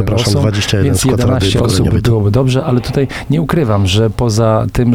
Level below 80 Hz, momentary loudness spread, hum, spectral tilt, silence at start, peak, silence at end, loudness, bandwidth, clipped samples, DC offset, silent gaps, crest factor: -30 dBFS; 3 LU; none; -6 dB/octave; 0 s; 0 dBFS; 0 s; -13 LUFS; 16 kHz; under 0.1%; 1%; none; 10 dB